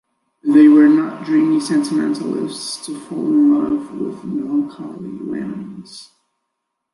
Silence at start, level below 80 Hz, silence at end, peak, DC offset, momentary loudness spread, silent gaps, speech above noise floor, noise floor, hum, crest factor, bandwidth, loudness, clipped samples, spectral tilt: 0.45 s; -62 dBFS; 0.9 s; -2 dBFS; under 0.1%; 19 LU; none; 60 dB; -76 dBFS; none; 16 dB; 11.5 kHz; -16 LUFS; under 0.1%; -5.5 dB/octave